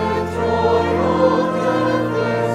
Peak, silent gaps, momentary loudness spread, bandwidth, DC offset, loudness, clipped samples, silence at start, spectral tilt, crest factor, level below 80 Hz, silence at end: -4 dBFS; none; 4 LU; 13 kHz; under 0.1%; -18 LUFS; under 0.1%; 0 s; -7 dB/octave; 14 dB; -42 dBFS; 0 s